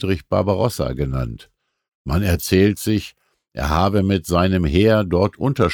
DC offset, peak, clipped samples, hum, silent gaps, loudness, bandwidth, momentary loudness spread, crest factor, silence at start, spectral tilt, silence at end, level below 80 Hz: under 0.1%; -4 dBFS; under 0.1%; none; 1.95-2.05 s; -19 LUFS; 19.5 kHz; 11 LU; 16 dB; 0 s; -6.5 dB/octave; 0 s; -34 dBFS